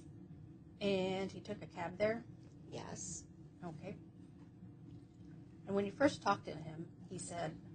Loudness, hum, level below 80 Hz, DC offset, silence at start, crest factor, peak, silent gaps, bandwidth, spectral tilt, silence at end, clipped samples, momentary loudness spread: -41 LUFS; none; -70 dBFS; under 0.1%; 0 s; 24 dB; -18 dBFS; none; 9 kHz; -5 dB/octave; 0 s; under 0.1%; 21 LU